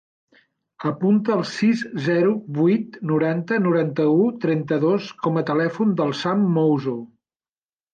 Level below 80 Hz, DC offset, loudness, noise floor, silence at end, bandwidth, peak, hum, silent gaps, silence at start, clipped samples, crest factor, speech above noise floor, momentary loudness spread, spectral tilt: -68 dBFS; under 0.1%; -21 LUFS; under -90 dBFS; 0.9 s; 8.8 kHz; -8 dBFS; none; none; 0.8 s; under 0.1%; 12 dB; over 70 dB; 5 LU; -7.5 dB/octave